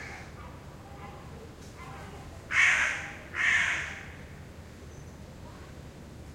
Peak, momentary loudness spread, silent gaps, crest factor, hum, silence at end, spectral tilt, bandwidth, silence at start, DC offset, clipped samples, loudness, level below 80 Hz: -10 dBFS; 23 LU; none; 24 dB; none; 0 s; -2 dB/octave; 16.5 kHz; 0 s; under 0.1%; under 0.1%; -26 LUFS; -54 dBFS